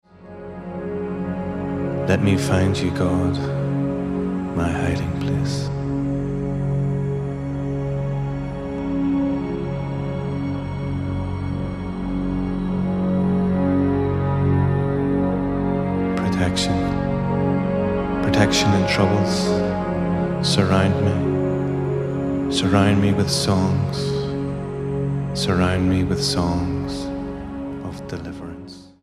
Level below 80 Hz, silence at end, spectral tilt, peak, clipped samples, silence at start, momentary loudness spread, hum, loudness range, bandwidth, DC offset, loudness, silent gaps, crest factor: -38 dBFS; 0.15 s; -6.5 dB/octave; -2 dBFS; under 0.1%; 0.2 s; 10 LU; none; 5 LU; 13 kHz; under 0.1%; -22 LUFS; none; 20 dB